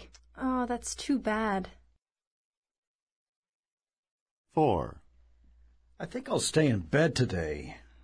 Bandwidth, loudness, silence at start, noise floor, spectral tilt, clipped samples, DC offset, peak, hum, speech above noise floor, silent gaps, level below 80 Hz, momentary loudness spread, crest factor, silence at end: 11 kHz; -30 LUFS; 0 s; -62 dBFS; -5 dB/octave; under 0.1%; under 0.1%; -12 dBFS; none; 32 dB; 2.27-2.51 s, 2.57-2.63 s, 2.78-3.43 s, 3.49-3.63 s, 3.72-3.77 s, 3.98-4.03 s, 4.11-4.44 s; -54 dBFS; 14 LU; 20 dB; 0.25 s